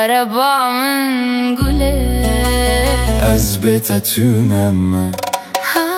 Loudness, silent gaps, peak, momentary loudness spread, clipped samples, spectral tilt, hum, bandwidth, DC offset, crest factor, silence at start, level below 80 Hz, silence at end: -15 LUFS; none; 0 dBFS; 3 LU; under 0.1%; -5 dB/octave; none; 16.5 kHz; under 0.1%; 14 dB; 0 s; -22 dBFS; 0 s